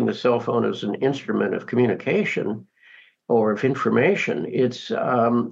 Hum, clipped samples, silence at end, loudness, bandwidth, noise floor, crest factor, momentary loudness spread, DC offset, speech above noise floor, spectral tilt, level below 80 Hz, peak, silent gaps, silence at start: none; under 0.1%; 0 s; -22 LUFS; 7.6 kHz; -52 dBFS; 16 dB; 5 LU; under 0.1%; 30 dB; -7 dB/octave; -72 dBFS; -6 dBFS; none; 0 s